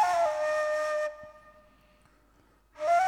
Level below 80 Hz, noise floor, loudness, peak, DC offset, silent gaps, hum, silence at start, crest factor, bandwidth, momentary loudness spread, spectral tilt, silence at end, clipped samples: -66 dBFS; -63 dBFS; -29 LUFS; -16 dBFS; under 0.1%; none; none; 0 s; 16 dB; 13.5 kHz; 17 LU; -1.5 dB/octave; 0 s; under 0.1%